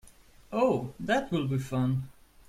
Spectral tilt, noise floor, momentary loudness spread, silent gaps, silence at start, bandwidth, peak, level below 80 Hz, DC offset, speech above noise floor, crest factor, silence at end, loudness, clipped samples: -7 dB/octave; -55 dBFS; 8 LU; none; 0.05 s; 14.5 kHz; -12 dBFS; -56 dBFS; under 0.1%; 26 dB; 18 dB; 0.35 s; -30 LUFS; under 0.1%